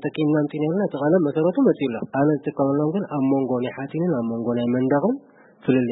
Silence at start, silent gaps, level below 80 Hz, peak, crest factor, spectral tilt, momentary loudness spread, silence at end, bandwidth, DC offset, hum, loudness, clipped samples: 0 s; none; -66 dBFS; -6 dBFS; 16 dB; -12.5 dB/octave; 6 LU; 0 s; 4 kHz; under 0.1%; none; -22 LUFS; under 0.1%